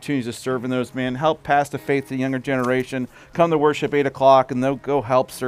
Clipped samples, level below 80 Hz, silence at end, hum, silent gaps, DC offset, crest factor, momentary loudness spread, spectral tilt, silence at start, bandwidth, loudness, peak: under 0.1%; -54 dBFS; 0 s; none; none; under 0.1%; 18 dB; 9 LU; -6 dB/octave; 0 s; 16 kHz; -21 LUFS; -2 dBFS